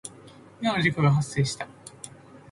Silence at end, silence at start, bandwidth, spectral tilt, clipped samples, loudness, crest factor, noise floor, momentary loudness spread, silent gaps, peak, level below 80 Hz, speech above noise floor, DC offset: 0.15 s; 0.05 s; 11.5 kHz; -5.5 dB/octave; under 0.1%; -25 LUFS; 18 dB; -49 dBFS; 20 LU; none; -10 dBFS; -56 dBFS; 25 dB; under 0.1%